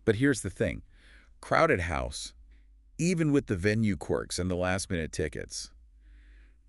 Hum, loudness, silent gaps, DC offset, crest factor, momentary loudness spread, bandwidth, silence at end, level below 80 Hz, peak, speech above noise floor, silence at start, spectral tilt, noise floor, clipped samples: none; -29 LUFS; none; under 0.1%; 22 dB; 14 LU; 12 kHz; 0.3 s; -48 dBFS; -8 dBFS; 28 dB; 0.05 s; -5.5 dB/octave; -56 dBFS; under 0.1%